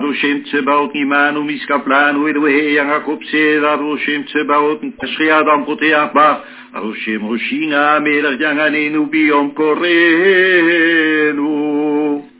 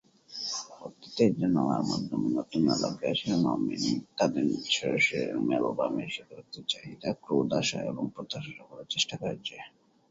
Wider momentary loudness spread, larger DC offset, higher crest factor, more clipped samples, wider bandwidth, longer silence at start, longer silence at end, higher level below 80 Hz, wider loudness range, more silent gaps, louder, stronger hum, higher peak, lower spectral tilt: second, 8 LU vs 13 LU; neither; second, 14 dB vs 20 dB; neither; second, 4 kHz vs 7.8 kHz; second, 0 s vs 0.3 s; second, 0.15 s vs 0.4 s; about the same, -64 dBFS vs -66 dBFS; about the same, 3 LU vs 4 LU; neither; first, -13 LUFS vs -30 LUFS; neither; first, 0 dBFS vs -10 dBFS; first, -7.5 dB/octave vs -4.5 dB/octave